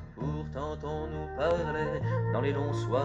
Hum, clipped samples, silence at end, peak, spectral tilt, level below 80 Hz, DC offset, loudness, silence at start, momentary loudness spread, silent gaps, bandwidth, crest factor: none; under 0.1%; 0 s; -16 dBFS; -7.5 dB/octave; -46 dBFS; under 0.1%; -32 LUFS; 0 s; 7 LU; none; 8 kHz; 16 dB